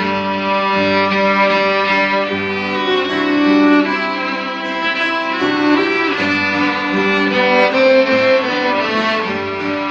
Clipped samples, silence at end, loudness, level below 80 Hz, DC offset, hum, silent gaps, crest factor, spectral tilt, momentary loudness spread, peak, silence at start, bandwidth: under 0.1%; 0 s; -14 LUFS; -56 dBFS; under 0.1%; none; none; 14 dB; -5.5 dB/octave; 7 LU; -2 dBFS; 0 s; 7.6 kHz